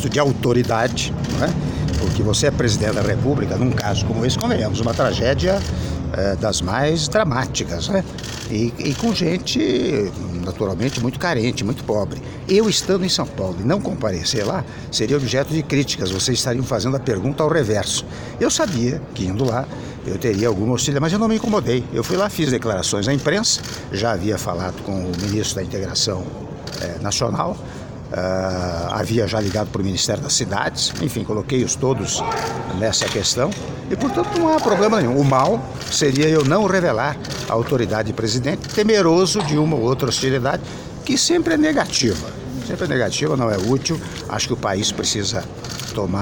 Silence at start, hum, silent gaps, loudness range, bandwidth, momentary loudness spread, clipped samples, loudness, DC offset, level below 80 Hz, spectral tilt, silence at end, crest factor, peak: 0 s; none; none; 3 LU; 17.5 kHz; 9 LU; under 0.1%; -20 LUFS; under 0.1%; -38 dBFS; -4.5 dB/octave; 0 s; 18 dB; -2 dBFS